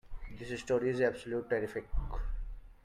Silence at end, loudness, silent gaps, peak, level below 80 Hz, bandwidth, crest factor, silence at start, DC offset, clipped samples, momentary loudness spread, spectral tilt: 0.1 s; -35 LUFS; none; -16 dBFS; -42 dBFS; 11.5 kHz; 18 dB; 0.05 s; under 0.1%; under 0.1%; 15 LU; -6 dB/octave